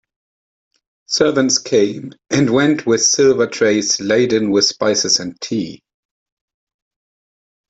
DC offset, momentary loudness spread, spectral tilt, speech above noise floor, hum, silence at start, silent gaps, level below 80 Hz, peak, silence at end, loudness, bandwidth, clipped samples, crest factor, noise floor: under 0.1%; 9 LU; -3 dB/octave; over 75 dB; none; 1.1 s; none; -58 dBFS; 0 dBFS; 1.95 s; -15 LUFS; 8.2 kHz; under 0.1%; 18 dB; under -90 dBFS